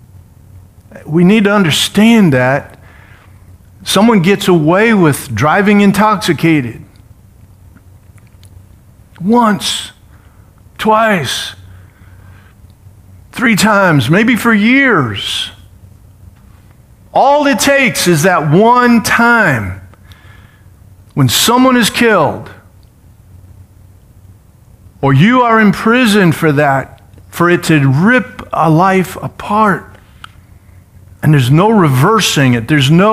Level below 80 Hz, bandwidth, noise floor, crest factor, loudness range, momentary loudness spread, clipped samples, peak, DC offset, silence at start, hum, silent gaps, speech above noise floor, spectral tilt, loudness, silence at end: -44 dBFS; 16 kHz; -42 dBFS; 12 dB; 7 LU; 10 LU; under 0.1%; 0 dBFS; under 0.1%; 0.55 s; none; none; 32 dB; -5 dB/octave; -10 LUFS; 0 s